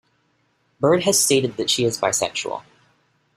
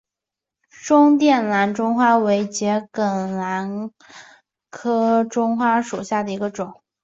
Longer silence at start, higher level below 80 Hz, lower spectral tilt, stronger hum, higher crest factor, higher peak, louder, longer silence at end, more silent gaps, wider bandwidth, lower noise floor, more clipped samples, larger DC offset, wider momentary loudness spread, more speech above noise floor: about the same, 0.8 s vs 0.8 s; first, -60 dBFS vs -66 dBFS; second, -3 dB/octave vs -5.5 dB/octave; neither; about the same, 18 dB vs 16 dB; about the same, -4 dBFS vs -4 dBFS; about the same, -19 LUFS vs -19 LUFS; first, 0.75 s vs 0.3 s; neither; first, 16 kHz vs 8 kHz; second, -66 dBFS vs -86 dBFS; neither; neither; second, 11 LU vs 14 LU; second, 46 dB vs 67 dB